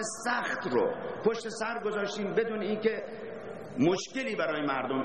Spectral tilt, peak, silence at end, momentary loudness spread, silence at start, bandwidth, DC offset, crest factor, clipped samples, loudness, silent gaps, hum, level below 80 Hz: -4.5 dB/octave; -12 dBFS; 0 s; 10 LU; 0 s; 10 kHz; 0.2%; 18 dB; under 0.1%; -31 LUFS; none; none; -68 dBFS